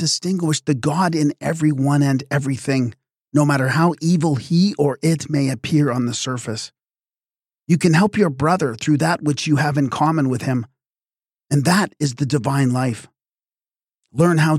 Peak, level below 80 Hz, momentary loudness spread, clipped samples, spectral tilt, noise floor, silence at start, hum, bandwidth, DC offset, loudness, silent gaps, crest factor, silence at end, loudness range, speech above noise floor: -2 dBFS; -58 dBFS; 7 LU; under 0.1%; -6 dB/octave; under -90 dBFS; 0 s; none; 15 kHz; under 0.1%; -19 LUFS; none; 16 dB; 0 s; 3 LU; over 72 dB